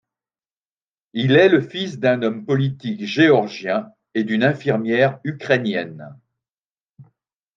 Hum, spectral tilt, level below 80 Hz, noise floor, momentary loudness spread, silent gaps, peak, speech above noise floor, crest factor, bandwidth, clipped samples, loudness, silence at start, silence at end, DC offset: none; -7 dB/octave; -68 dBFS; under -90 dBFS; 13 LU; 6.58-6.75 s, 6.81-6.94 s; -2 dBFS; over 71 dB; 20 dB; 7.4 kHz; under 0.1%; -19 LUFS; 1.15 s; 0.55 s; under 0.1%